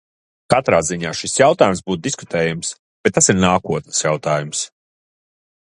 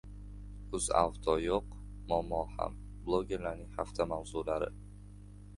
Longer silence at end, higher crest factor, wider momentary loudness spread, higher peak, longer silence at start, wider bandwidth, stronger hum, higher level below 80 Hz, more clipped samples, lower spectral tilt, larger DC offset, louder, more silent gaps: first, 1.1 s vs 0 s; second, 18 dB vs 24 dB; second, 10 LU vs 19 LU; first, 0 dBFS vs -12 dBFS; first, 0.5 s vs 0.05 s; about the same, 11.5 kHz vs 11.5 kHz; second, none vs 50 Hz at -45 dBFS; about the same, -46 dBFS vs -48 dBFS; neither; second, -3.5 dB/octave vs -5 dB/octave; neither; first, -17 LUFS vs -35 LUFS; first, 2.79-3.04 s vs none